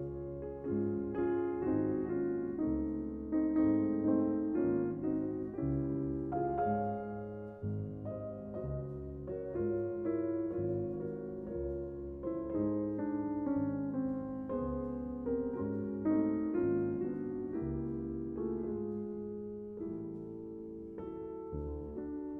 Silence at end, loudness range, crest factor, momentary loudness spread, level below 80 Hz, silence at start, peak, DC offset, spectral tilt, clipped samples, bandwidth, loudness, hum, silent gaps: 0 s; 7 LU; 16 dB; 10 LU; -54 dBFS; 0 s; -20 dBFS; under 0.1%; -12.5 dB/octave; under 0.1%; 3 kHz; -37 LUFS; none; none